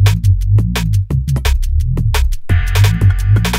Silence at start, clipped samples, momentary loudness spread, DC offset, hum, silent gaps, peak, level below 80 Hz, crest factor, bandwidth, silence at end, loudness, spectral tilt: 0 s; under 0.1%; 5 LU; under 0.1%; none; none; -2 dBFS; -16 dBFS; 10 dB; 16 kHz; 0 s; -14 LUFS; -5.5 dB/octave